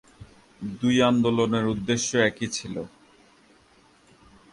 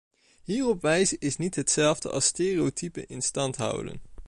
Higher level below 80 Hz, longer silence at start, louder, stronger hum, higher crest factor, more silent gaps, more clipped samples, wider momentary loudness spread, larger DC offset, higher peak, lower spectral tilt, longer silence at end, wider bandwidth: about the same, -56 dBFS vs -54 dBFS; second, 0.2 s vs 0.5 s; about the same, -24 LUFS vs -26 LUFS; neither; about the same, 20 dB vs 18 dB; neither; neither; first, 16 LU vs 12 LU; neither; first, -6 dBFS vs -10 dBFS; about the same, -4.5 dB/octave vs -3.5 dB/octave; first, 1.65 s vs 0 s; about the same, 11.5 kHz vs 11.5 kHz